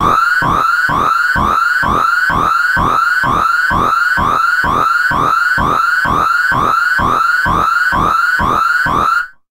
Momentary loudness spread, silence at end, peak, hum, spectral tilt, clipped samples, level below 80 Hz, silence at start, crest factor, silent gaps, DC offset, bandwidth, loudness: 0 LU; 0.2 s; -2 dBFS; none; -4 dB/octave; under 0.1%; -32 dBFS; 0 s; 12 dB; none; under 0.1%; 16 kHz; -11 LUFS